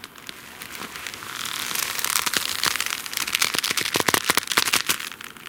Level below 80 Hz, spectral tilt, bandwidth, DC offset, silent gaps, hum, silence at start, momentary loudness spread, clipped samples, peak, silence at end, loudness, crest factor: -60 dBFS; 0 dB/octave; 17.5 kHz; under 0.1%; none; none; 0 s; 14 LU; under 0.1%; 0 dBFS; 0 s; -22 LUFS; 26 dB